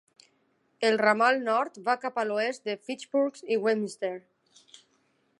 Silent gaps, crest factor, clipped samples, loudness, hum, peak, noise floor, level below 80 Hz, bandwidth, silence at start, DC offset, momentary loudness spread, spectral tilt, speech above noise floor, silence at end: none; 22 dB; under 0.1%; -27 LUFS; none; -8 dBFS; -71 dBFS; -86 dBFS; 11.5 kHz; 0.8 s; under 0.1%; 12 LU; -4 dB/octave; 43 dB; 1.2 s